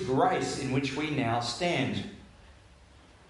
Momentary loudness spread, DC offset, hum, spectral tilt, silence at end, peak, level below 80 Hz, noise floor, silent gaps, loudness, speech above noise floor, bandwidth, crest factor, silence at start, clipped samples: 7 LU; under 0.1%; none; -5 dB/octave; 0.8 s; -12 dBFS; -56 dBFS; -56 dBFS; none; -29 LUFS; 27 dB; 11.5 kHz; 18 dB; 0 s; under 0.1%